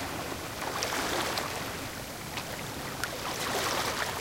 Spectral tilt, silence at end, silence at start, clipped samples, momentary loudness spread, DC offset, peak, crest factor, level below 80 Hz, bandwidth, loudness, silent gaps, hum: -2.5 dB/octave; 0 s; 0 s; under 0.1%; 7 LU; under 0.1%; -10 dBFS; 24 dB; -52 dBFS; 17 kHz; -33 LUFS; none; none